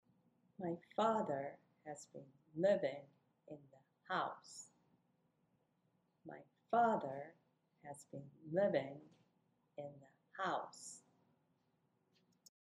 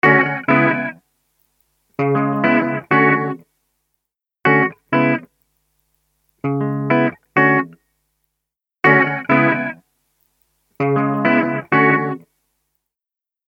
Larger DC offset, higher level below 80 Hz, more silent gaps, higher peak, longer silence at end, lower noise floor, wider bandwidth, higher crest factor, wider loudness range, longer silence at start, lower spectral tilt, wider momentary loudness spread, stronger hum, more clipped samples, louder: neither; second, -90 dBFS vs -64 dBFS; neither; second, -22 dBFS vs 0 dBFS; first, 1.7 s vs 1.3 s; second, -81 dBFS vs -89 dBFS; first, 12 kHz vs 6 kHz; about the same, 22 dB vs 18 dB; first, 9 LU vs 3 LU; first, 0.6 s vs 0.05 s; second, -5.5 dB/octave vs -9 dB/octave; first, 22 LU vs 12 LU; neither; neither; second, -40 LUFS vs -17 LUFS